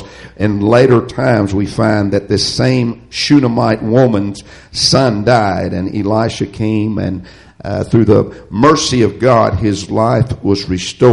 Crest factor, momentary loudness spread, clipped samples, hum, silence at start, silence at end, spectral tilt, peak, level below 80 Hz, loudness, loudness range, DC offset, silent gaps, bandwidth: 12 dB; 9 LU; under 0.1%; none; 0 s; 0 s; -6 dB/octave; 0 dBFS; -38 dBFS; -13 LUFS; 2 LU; under 0.1%; none; 11.5 kHz